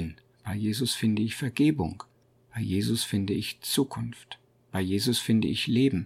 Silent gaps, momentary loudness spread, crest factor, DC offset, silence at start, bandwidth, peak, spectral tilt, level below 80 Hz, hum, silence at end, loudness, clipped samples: none; 15 LU; 16 dB; under 0.1%; 0 s; 16.5 kHz; -12 dBFS; -5 dB/octave; -56 dBFS; none; 0 s; -28 LUFS; under 0.1%